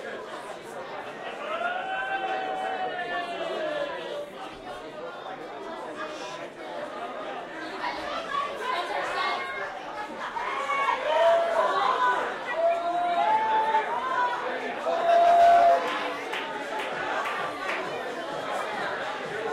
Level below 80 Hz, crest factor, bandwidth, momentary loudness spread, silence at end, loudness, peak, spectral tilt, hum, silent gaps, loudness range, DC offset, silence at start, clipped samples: -66 dBFS; 18 dB; 13 kHz; 15 LU; 0 s; -27 LUFS; -10 dBFS; -3 dB/octave; none; none; 12 LU; under 0.1%; 0 s; under 0.1%